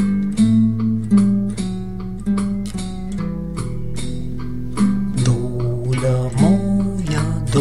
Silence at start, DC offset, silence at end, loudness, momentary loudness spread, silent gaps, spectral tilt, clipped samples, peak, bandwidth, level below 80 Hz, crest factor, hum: 0 s; 2%; 0 s; -20 LUFS; 12 LU; none; -7.5 dB/octave; under 0.1%; -4 dBFS; 11.5 kHz; -34 dBFS; 16 dB; none